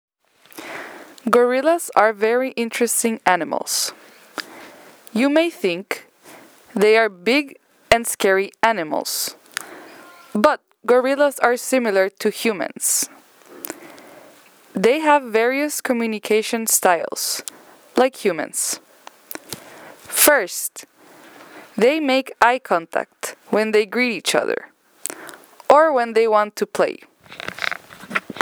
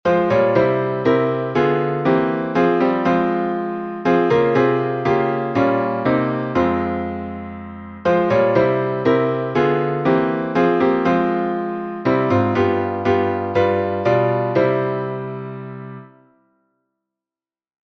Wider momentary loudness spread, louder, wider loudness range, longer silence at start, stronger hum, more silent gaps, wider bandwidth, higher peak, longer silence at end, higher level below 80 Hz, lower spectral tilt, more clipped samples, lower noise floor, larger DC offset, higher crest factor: first, 17 LU vs 10 LU; about the same, -19 LUFS vs -18 LUFS; about the same, 3 LU vs 3 LU; first, 0.55 s vs 0.05 s; neither; neither; first, over 20 kHz vs 6.4 kHz; first, 0 dBFS vs -4 dBFS; second, 0 s vs 1.9 s; second, -60 dBFS vs -52 dBFS; second, -2.5 dB/octave vs -8.5 dB/octave; neither; second, -50 dBFS vs under -90 dBFS; neither; about the same, 20 dB vs 16 dB